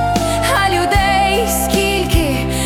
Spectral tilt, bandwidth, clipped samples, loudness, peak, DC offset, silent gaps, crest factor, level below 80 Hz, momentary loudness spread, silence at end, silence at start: -4 dB/octave; 18 kHz; under 0.1%; -14 LUFS; -2 dBFS; under 0.1%; none; 14 dB; -24 dBFS; 3 LU; 0 s; 0 s